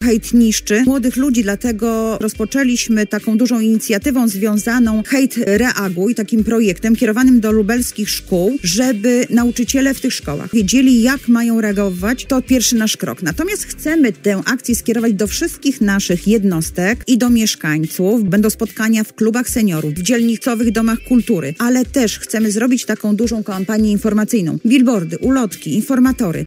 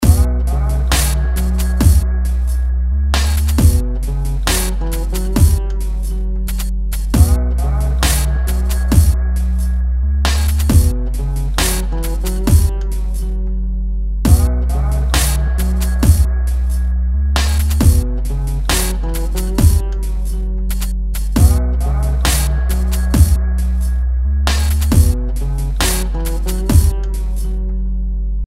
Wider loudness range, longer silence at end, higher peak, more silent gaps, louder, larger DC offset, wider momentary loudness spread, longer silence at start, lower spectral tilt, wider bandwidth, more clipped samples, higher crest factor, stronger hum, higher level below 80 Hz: about the same, 2 LU vs 2 LU; about the same, 0 s vs 0 s; about the same, -2 dBFS vs 0 dBFS; neither; about the same, -15 LUFS vs -17 LUFS; neither; second, 5 LU vs 9 LU; about the same, 0 s vs 0 s; about the same, -4.5 dB/octave vs -5 dB/octave; about the same, 16.5 kHz vs 16.5 kHz; neither; about the same, 14 dB vs 14 dB; neither; second, -38 dBFS vs -14 dBFS